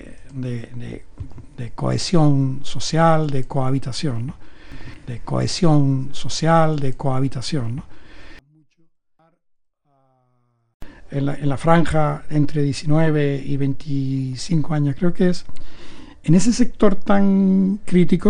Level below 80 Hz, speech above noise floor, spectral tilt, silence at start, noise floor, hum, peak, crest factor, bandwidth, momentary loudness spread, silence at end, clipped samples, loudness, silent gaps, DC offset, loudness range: -38 dBFS; 47 dB; -6.5 dB/octave; 0.05 s; -64 dBFS; none; 0 dBFS; 18 dB; 10.5 kHz; 17 LU; 0 s; under 0.1%; -20 LUFS; 10.74-10.80 s; under 0.1%; 9 LU